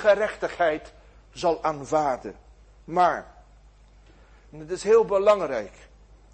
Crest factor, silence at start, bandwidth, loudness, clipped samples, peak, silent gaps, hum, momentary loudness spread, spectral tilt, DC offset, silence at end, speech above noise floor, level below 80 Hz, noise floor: 18 dB; 0 s; 8.8 kHz; -24 LUFS; under 0.1%; -8 dBFS; none; 50 Hz at -55 dBFS; 15 LU; -4.5 dB/octave; under 0.1%; 0.65 s; 29 dB; -52 dBFS; -53 dBFS